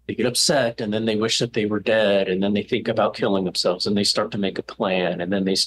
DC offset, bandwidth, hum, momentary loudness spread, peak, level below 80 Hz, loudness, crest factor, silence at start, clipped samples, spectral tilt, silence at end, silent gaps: under 0.1%; 12.5 kHz; none; 5 LU; -8 dBFS; -60 dBFS; -21 LUFS; 14 dB; 0.1 s; under 0.1%; -4 dB/octave; 0 s; none